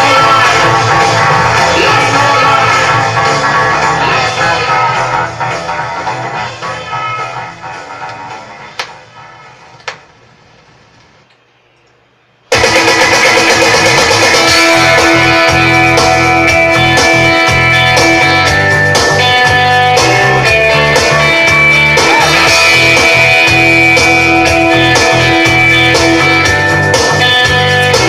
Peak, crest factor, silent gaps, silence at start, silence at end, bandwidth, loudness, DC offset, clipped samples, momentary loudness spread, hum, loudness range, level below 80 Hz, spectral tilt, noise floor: 0 dBFS; 8 dB; none; 0 s; 0 s; 16.5 kHz; -7 LUFS; under 0.1%; 0.2%; 13 LU; none; 14 LU; -34 dBFS; -3 dB/octave; -49 dBFS